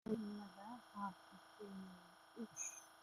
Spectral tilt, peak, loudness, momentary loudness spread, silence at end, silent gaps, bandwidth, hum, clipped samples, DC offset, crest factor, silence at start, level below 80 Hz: -4 dB/octave; -30 dBFS; -51 LUFS; 15 LU; 0 s; none; 15.5 kHz; none; under 0.1%; under 0.1%; 20 dB; 0.05 s; -82 dBFS